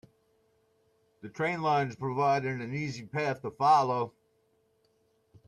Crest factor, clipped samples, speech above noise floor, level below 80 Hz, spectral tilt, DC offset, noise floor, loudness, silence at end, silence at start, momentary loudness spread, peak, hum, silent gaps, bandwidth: 18 dB; under 0.1%; 42 dB; -72 dBFS; -6 dB/octave; under 0.1%; -71 dBFS; -29 LUFS; 1.4 s; 1.25 s; 11 LU; -14 dBFS; none; none; 12 kHz